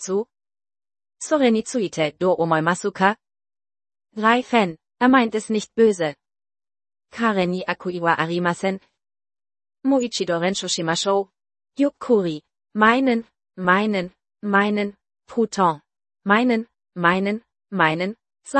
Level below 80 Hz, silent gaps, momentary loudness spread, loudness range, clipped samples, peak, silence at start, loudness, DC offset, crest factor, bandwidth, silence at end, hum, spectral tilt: -64 dBFS; none; 14 LU; 3 LU; under 0.1%; 0 dBFS; 0 s; -21 LUFS; under 0.1%; 22 dB; 8.8 kHz; 0 s; none; -5 dB/octave